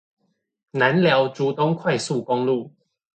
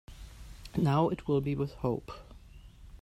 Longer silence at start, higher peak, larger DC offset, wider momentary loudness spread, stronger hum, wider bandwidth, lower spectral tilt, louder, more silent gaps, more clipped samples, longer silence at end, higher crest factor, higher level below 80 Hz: first, 0.75 s vs 0.1 s; first, -4 dBFS vs -14 dBFS; neither; second, 7 LU vs 23 LU; neither; second, 9.2 kHz vs 13 kHz; second, -5.5 dB/octave vs -8.5 dB/octave; first, -21 LUFS vs -31 LUFS; neither; neither; first, 0.45 s vs 0.05 s; about the same, 18 dB vs 18 dB; second, -68 dBFS vs -50 dBFS